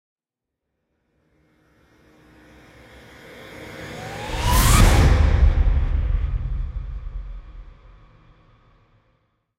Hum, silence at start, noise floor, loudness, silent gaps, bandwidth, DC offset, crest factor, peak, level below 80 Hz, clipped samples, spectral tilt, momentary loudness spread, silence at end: none; 3.3 s; -85 dBFS; -20 LUFS; none; 16 kHz; under 0.1%; 20 dB; -2 dBFS; -24 dBFS; under 0.1%; -4.5 dB/octave; 25 LU; 1.95 s